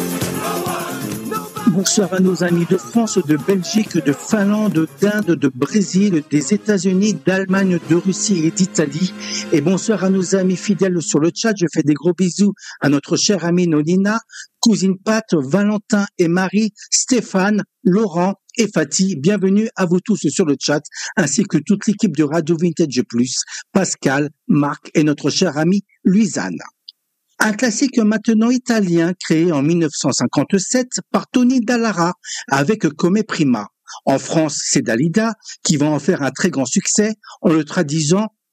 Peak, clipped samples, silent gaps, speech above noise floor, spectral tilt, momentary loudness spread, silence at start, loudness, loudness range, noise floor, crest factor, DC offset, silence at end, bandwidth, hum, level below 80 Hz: 0 dBFS; under 0.1%; none; 36 dB; -5 dB/octave; 5 LU; 0 s; -17 LUFS; 1 LU; -52 dBFS; 16 dB; under 0.1%; 0.25 s; 15.5 kHz; none; -64 dBFS